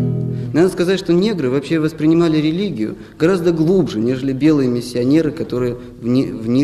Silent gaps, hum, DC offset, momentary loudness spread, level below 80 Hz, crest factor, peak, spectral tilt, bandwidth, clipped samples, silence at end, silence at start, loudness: none; none; under 0.1%; 7 LU; -44 dBFS; 14 dB; -2 dBFS; -7.5 dB/octave; 13 kHz; under 0.1%; 0 s; 0 s; -17 LUFS